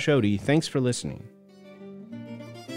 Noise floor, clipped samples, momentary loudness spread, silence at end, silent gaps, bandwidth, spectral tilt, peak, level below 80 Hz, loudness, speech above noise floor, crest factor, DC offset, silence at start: -49 dBFS; under 0.1%; 21 LU; 0 s; none; 16 kHz; -5.5 dB/octave; -10 dBFS; -60 dBFS; -25 LUFS; 25 dB; 18 dB; under 0.1%; 0 s